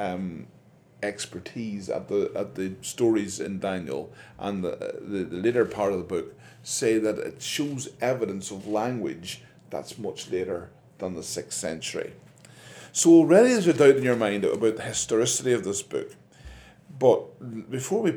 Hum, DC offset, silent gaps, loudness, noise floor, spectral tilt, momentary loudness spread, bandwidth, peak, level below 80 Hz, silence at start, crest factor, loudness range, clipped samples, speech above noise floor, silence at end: none; under 0.1%; none; -25 LUFS; -49 dBFS; -4.5 dB/octave; 18 LU; 17.5 kHz; -4 dBFS; -62 dBFS; 0 s; 22 dB; 12 LU; under 0.1%; 24 dB; 0 s